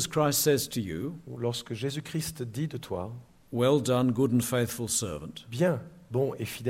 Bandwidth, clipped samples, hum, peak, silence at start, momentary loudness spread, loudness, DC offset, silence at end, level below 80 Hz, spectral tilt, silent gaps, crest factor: 16 kHz; under 0.1%; none; -14 dBFS; 0 s; 12 LU; -29 LUFS; under 0.1%; 0 s; -58 dBFS; -5 dB/octave; none; 16 dB